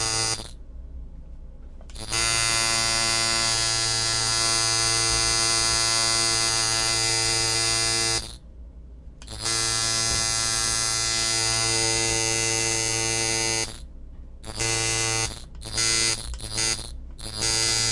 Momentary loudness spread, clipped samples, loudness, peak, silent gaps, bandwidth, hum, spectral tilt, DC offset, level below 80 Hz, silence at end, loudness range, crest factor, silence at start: 10 LU; under 0.1%; -21 LUFS; -10 dBFS; none; 12 kHz; none; -1 dB/octave; under 0.1%; -40 dBFS; 0 s; 5 LU; 16 dB; 0 s